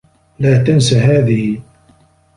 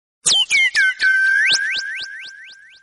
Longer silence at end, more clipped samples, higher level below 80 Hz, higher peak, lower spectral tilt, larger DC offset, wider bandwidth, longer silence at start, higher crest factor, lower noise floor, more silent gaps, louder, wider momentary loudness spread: first, 0.75 s vs 0.3 s; neither; first, -42 dBFS vs -62 dBFS; about the same, 0 dBFS vs -2 dBFS; first, -6.5 dB/octave vs 3 dB/octave; neither; about the same, 11 kHz vs 11.5 kHz; first, 0.4 s vs 0.25 s; about the same, 14 dB vs 16 dB; first, -51 dBFS vs -41 dBFS; neither; about the same, -13 LUFS vs -14 LUFS; second, 9 LU vs 16 LU